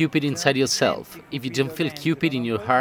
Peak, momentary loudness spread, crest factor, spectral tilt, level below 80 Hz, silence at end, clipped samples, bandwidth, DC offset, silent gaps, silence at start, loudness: -2 dBFS; 10 LU; 22 dB; -4.5 dB/octave; -58 dBFS; 0 s; under 0.1%; 16 kHz; under 0.1%; none; 0 s; -23 LUFS